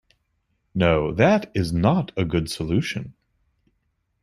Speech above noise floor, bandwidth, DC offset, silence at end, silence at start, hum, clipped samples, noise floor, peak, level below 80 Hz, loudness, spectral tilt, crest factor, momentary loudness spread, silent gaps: 51 dB; 13 kHz; under 0.1%; 1.1 s; 0.75 s; none; under 0.1%; -72 dBFS; -4 dBFS; -46 dBFS; -22 LUFS; -6.5 dB/octave; 20 dB; 12 LU; none